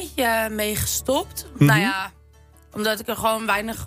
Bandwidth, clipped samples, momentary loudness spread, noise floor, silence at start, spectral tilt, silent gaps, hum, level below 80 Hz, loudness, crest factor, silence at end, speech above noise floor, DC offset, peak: 16 kHz; under 0.1%; 11 LU; -51 dBFS; 0 s; -4 dB/octave; none; none; -44 dBFS; -21 LUFS; 18 dB; 0 s; 29 dB; under 0.1%; -4 dBFS